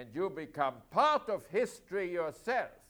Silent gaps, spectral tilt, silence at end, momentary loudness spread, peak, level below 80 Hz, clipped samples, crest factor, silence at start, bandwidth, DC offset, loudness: none; -4.5 dB/octave; 0.15 s; 9 LU; -16 dBFS; -70 dBFS; under 0.1%; 18 dB; 0 s; over 20 kHz; under 0.1%; -34 LUFS